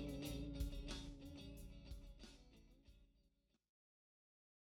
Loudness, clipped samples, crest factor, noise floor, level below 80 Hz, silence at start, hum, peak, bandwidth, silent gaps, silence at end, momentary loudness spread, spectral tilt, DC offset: -53 LUFS; under 0.1%; 20 dB; -81 dBFS; -56 dBFS; 0 s; none; -34 dBFS; 18.5 kHz; none; 1.55 s; 16 LU; -5.5 dB/octave; under 0.1%